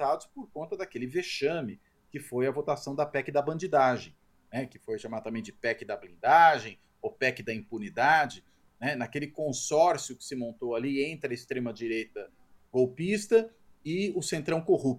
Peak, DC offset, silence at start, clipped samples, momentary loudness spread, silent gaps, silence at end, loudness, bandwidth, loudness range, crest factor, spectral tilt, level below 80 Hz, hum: -8 dBFS; under 0.1%; 0 s; under 0.1%; 16 LU; none; 0 s; -29 LUFS; 15.5 kHz; 5 LU; 22 dB; -4.5 dB/octave; -68 dBFS; none